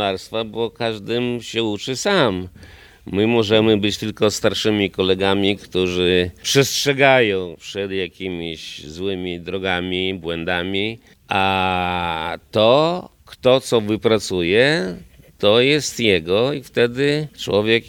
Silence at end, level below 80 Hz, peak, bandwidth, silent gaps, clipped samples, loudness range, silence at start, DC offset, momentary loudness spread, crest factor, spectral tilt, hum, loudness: 0 s; -52 dBFS; 0 dBFS; 18.5 kHz; none; under 0.1%; 5 LU; 0 s; under 0.1%; 11 LU; 20 dB; -4.5 dB/octave; none; -19 LUFS